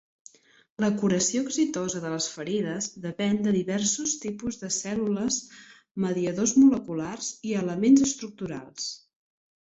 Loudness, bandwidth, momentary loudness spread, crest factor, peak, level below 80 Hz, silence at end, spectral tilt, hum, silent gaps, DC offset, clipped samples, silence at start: -26 LUFS; 8 kHz; 14 LU; 18 dB; -8 dBFS; -62 dBFS; 0.65 s; -4 dB/octave; none; 5.91-5.95 s; under 0.1%; under 0.1%; 0.8 s